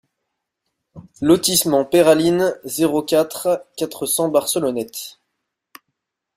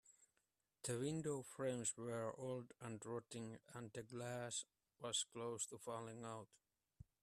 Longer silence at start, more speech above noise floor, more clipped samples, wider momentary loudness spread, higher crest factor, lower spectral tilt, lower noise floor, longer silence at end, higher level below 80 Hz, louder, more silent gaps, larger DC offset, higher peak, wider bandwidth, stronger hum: first, 0.95 s vs 0.05 s; first, 60 dB vs 40 dB; neither; about the same, 12 LU vs 11 LU; about the same, 18 dB vs 20 dB; about the same, -4 dB/octave vs -3.5 dB/octave; second, -78 dBFS vs -88 dBFS; first, 1.25 s vs 0.2 s; first, -58 dBFS vs -82 dBFS; first, -18 LUFS vs -48 LUFS; neither; neither; first, -2 dBFS vs -30 dBFS; first, 16 kHz vs 14.5 kHz; neither